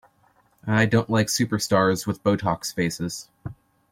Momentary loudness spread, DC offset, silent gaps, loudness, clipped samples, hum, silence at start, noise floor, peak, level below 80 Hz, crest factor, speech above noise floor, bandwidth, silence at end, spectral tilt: 17 LU; under 0.1%; none; -23 LUFS; under 0.1%; none; 0.65 s; -62 dBFS; -6 dBFS; -56 dBFS; 18 dB; 39 dB; 16.5 kHz; 0.4 s; -5 dB/octave